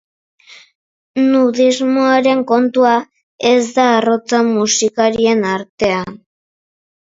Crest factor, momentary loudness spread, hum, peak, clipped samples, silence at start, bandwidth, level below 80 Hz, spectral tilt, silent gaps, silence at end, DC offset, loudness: 14 dB; 6 LU; none; 0 dBFS; under 0.1%; 1.15 s; 7.8 kHz; -56 dBFS; -3.5 dB/octave; 3.23-3.39 s, 5.69-5.78 s; 0.85 s; under 0.1%; -14 LUFS